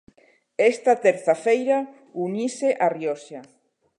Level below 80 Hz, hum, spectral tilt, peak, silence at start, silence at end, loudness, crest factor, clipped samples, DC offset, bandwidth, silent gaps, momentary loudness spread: -78 dBFS; none; -5 dB/octave; -4 dBFS; 0.6 s; 0.55 s; -22 LUFS; 20 dB; under 0.1%; under 0.1%; 11 kHz; none; 15 LU